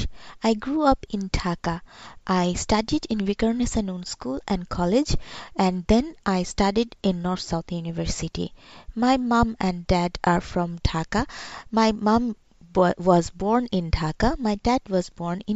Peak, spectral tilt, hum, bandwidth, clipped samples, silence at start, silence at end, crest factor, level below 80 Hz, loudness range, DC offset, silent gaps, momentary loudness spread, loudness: -6 dBFS; -5.5 dB/octave; none; 8.8 kHz; under 0.1%; 0 s; 0 s; 18 dB; -36 dBFS; 2 LU; under 0.1%; none; 10 LU; -24 LUFS